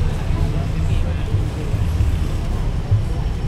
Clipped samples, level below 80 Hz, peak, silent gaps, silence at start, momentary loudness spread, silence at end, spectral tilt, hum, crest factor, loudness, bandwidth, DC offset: under 0.1%; -22 dBFS; -6 dBFS; none; 0 s; 4 LU; 0 s; -7.5 dB/octave; none; 12 dB; -22 LUFS; 13 kHz; under 0.1%